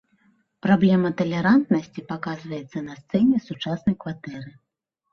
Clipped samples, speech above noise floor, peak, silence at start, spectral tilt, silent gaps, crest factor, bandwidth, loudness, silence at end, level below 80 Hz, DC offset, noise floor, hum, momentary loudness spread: under 0.1%; 41 dB; -6 dBFS; 0.65 s; -8 dB/octave; none; 18 dB; 6.6 kHz; -23 LUFS; 0.6 s; -58 dBFS; under 0.1%; -63 dBFS; none; 15 LU